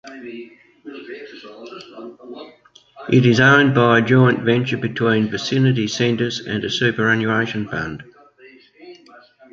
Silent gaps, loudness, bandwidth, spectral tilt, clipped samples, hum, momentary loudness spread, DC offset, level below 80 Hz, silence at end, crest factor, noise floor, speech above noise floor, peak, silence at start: none; -17 LUFS; 7.6 kHz; -6 dB/octave; under 0.1%; none; 24 LU; under 0.1%; -54 dBFS; 0.6 s; 18 dB; -48 dBFS; 30 dB; -2 dBFS; 0.05 s